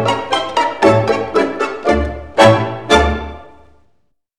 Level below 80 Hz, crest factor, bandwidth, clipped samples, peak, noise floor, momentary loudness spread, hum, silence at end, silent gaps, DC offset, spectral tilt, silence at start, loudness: -30 dBFS; 16 dB; 13 kHz; under 0.1%; 0 dBFS; -61 dBFS; 8 LU; none; 0.95 s; none; 0.9%; -5 dB/octave; 0 s; -14 LUFS